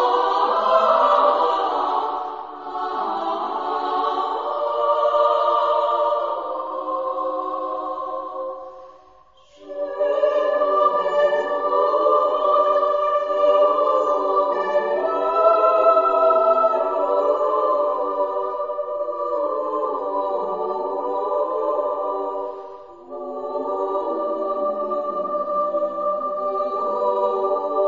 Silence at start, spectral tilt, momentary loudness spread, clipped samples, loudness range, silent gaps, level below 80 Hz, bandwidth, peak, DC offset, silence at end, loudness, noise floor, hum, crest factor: 0 s; -4.5 dB/octave; 11 LU; under 0.1%; 8 LU; none; -66 dBFS; 7.4 kHz; -4 dBFS; 0.2%; 0 s; -21 LUFS; -52 dBFS; none; 18 dB